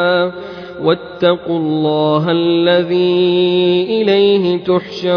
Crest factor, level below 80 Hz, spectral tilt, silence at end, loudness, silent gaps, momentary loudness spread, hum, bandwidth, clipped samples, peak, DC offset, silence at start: 12 dB; -54 dBFS; -8 dB/octave; 0 s; -14 LUFS; none; 5 LU; none; 5.4 kHz; under 0.1%; -2 dBFS; under 0.1%; 0 s